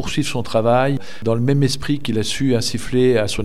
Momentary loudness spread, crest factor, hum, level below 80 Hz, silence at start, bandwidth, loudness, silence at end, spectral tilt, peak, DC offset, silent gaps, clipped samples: 6 LU; 14 dB; none; -40 dBFS; 0 s; 15 kHz; -19 LUFS; 0 s; -5.5 dB/octave; -4 dBFS; 5%; none; under 0.1%